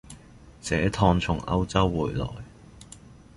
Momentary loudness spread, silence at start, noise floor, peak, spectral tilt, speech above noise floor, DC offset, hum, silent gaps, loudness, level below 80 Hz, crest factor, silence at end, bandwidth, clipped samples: 24 LU; 0.1 s; -49 dBFS; -6 dBFS; -6 dB/octave; 25 dB; under 0.1%; none; none; -25 LUFS; -40 dBFS; 20 dB; 0.25 s; 11.5 kHz; under 0.1%